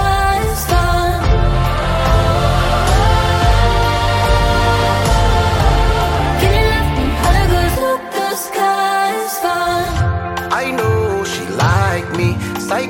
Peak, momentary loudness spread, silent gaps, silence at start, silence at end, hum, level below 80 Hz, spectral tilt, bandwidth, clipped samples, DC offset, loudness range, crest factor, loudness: 0 dBFS; 5 LU; none; 0 s; 0 s; none; -20 dBFS; -5 dB/octave; 17 kHz; under 0.1%; under 0.1%; 3 LU; 12 dB; -15 LUFS